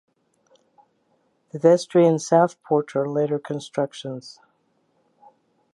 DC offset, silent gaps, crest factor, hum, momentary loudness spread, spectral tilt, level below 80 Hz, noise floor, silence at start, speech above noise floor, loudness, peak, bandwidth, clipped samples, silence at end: under 0.1%; none; 20 dB; none; 17 LU; -6.5 dB/octave; -78 dBFS; -67 dBFS; 1.55 s; 46 dB; -21 LUFS; -4 dBFS; 11.5 kHz; under 0.1%; 1.45 s